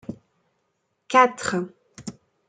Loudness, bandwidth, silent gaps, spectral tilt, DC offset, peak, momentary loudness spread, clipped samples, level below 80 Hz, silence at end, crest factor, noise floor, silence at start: -21 LUFS; 9.4 kHz; none; -4 dB/octave; under 0.1%; -2 dBFS; 22 LU; under 0.1%; -66 dBFS; 0.35 s; 24 dB; -74 dBFS; 0.1 s